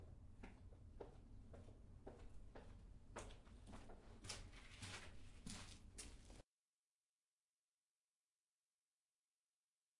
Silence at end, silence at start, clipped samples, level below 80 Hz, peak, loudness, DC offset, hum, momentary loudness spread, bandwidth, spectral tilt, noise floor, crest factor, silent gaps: 3.55 s; 0 s; under 0.1%; -66 dBFS; -34 dBFS; -60 LUFS; under 0.1%; none; 10 LU; 11.5 kHz; -3.5 dB/octave; under -90 dBFS; 26 dB; none